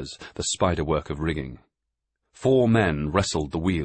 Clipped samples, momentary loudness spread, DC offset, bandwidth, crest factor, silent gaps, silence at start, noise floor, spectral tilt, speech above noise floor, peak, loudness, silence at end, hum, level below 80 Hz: under 0.1%; 11 LU; under 0.1%; 8.8 kHz; 18 dB; none; 0 s; -83 dBFS; -5.5 dB/octave; 59 dB; -6 dBFS; -24 LUFS; 0 s; none; -42 dBFS